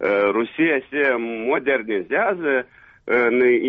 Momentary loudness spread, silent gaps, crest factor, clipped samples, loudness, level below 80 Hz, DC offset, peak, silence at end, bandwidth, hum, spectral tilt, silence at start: 6 LU; none; 12 dB; under 0.1%; -20 LUFS; -62 dBFS; under 0.1%; -8 dBFS; 0 s; 4.7 kHz; none; -3 dB/octave; 0 s